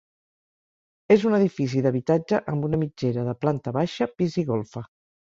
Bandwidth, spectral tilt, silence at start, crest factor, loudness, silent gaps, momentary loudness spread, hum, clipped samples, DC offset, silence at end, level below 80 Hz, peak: 7.6 kHz; -8 dB/octave; 1.1 s; 20 dB; -24 LUFS; none; 7 LU; none; under 0.1%; under 0.1%; 0.45 s; -58 dBFS; -4 dBFS